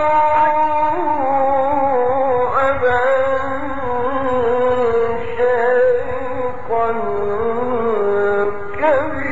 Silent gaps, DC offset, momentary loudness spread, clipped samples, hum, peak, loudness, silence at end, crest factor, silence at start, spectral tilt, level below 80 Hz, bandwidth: none; 6%; 7 LU; under 0.1%; none; -4 dBFS; -17 LUFS; 0 s; 12 dB; 0 s; -4 dB/octave; -44 dBFS; 7.6 kHz